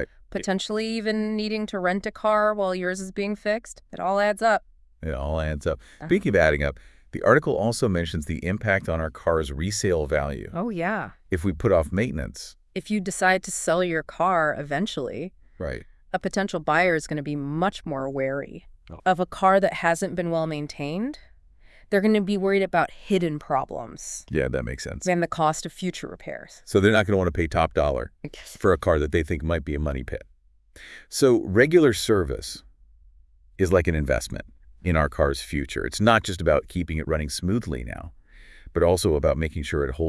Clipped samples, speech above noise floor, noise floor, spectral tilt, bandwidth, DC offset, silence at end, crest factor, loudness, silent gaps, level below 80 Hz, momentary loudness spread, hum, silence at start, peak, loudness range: under 0.1%; 30 dB; -54 dBFS; -5.5 dB/octave; 12 kHz; under 0.1%; 0 s; 22 dB; -24 LUFS; none; -40 dBFS; 14 LU; none; 0 s; -2 dBFS; 3 LU